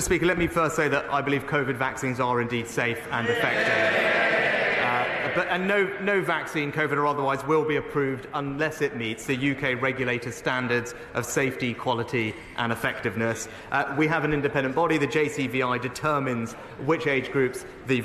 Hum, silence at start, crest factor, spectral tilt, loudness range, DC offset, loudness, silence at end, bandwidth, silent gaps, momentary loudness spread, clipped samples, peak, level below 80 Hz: none; 0 s; 14 dB; -5 dB/octave; 4 LU; under 0.1%; -25 LUFS; 0 s; 14 kHz; none; 6 LU; under 0.1%; -12 dBFS; -52 dBFS